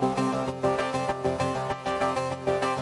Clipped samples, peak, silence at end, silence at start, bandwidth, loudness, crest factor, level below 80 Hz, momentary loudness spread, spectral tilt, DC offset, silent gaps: under 0.1%; -12 dBFS; 0 s; 0 s; 11.5 kHz; -28 LUFS; 16 dB; -54 dBFS; 2 LU; -5.5 dB/octave; under 0.1%; none